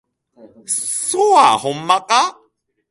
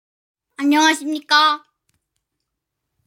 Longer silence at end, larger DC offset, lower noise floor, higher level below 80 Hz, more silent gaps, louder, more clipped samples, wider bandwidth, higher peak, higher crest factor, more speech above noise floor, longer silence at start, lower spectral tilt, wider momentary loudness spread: second, 0.6 s vs 1.5 s; neither; second, -62 dBFS vs -79 dBFS; first, -66 dBFS vs -82 dBFS; neither; about the same, -15 LUFS vs -17 LUFS; neither; second, 11.5 kHz vs 16.5 kHz; first, 0 dBFS vs -4 dBFS; about the same, 18 dB vs 18 dB; second, 46 dB vs 63 dB; second, 0.45 s vs 0.6 s; first, -1.5 dB/octave vs 0.5 dB/octave; about the same, 10 LU vs 9 LU